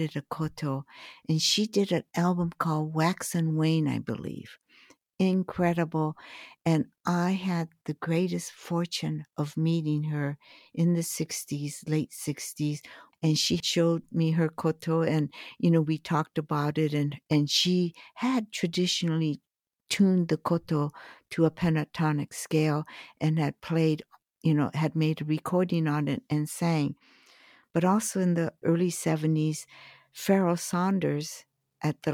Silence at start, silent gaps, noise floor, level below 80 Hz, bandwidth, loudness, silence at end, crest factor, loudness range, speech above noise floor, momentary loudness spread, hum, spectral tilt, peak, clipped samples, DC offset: 0 s; none; -59 dBFS; -66 dBFS; 16 kHz; -28 LUFS; 0 s; 16 dB; 3 LU; 32 dB; 9 LU; none; -5.5 dB/octave; -12 dBFS; under 0.1%; under 0.1%